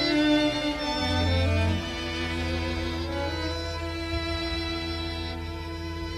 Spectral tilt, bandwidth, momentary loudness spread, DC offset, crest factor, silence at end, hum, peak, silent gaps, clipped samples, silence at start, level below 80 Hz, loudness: -5.5 dB/octave; 13.5 kHz; 10 LU; under 0.1%; 16 dB; 0 s; 50 Hz at -45 dBFS; -12 dBFS; none; under 0.1%; 0 s; -38 dBFS; -28 LUFS